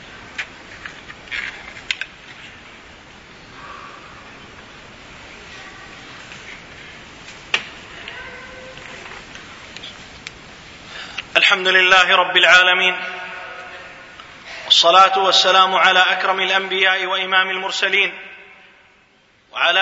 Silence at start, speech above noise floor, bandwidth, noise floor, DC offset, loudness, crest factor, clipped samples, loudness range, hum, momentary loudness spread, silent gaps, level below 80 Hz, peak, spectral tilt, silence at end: 0 s; 40 dB; 8 kHz; -55 dBFS; under 0.1%; -14 LUFS; 20 dB; under 0.1%; 23 LU; none; 26 LU; none; -54 dBFS; 0 dBFS; -1 dB/octave; 0 s